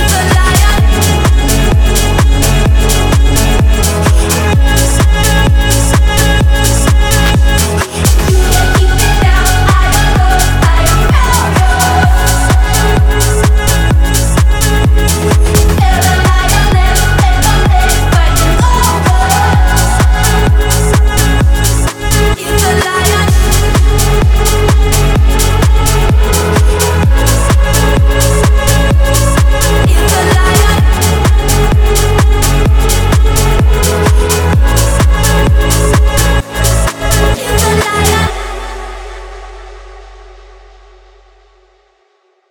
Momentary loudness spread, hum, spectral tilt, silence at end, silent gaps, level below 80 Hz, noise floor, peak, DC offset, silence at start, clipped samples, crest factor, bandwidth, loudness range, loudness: 2 LU; none; -4.5 dB/octave; 2.25 s; none; -10 dBFS; -54 dBFS; 0 dBFS; under 0.1%; 0 s; under 0.1%; 8 dB; 20 kHz; 1 LU; -9 LUFS